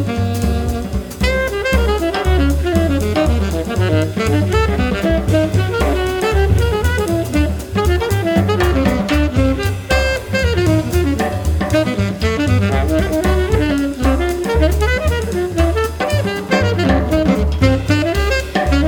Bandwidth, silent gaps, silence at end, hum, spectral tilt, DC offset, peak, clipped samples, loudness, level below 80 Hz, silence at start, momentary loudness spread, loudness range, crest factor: 18.5 kHz; none; 0 s; none; -6.5 dB/octave; under 0.1%; 0 dBFS; under 0.1%; -16 LUFS; -20 dBFS; 0 s; 4 LU; 1 LU; 14 dB